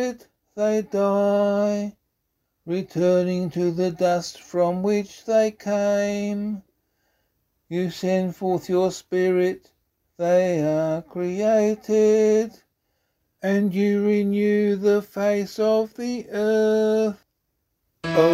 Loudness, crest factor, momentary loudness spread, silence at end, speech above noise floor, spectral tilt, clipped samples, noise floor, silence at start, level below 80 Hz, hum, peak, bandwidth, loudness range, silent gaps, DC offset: -22 LUFS; 20 dB; 9 LU; 0 s; 54 dB; -6.5 dB/octave; under 0.1%; -75 dBFS; 0 s; -64 dBFS; none; -2 dBFS; 15.5 kHz; 4 LU; none; under 0.1%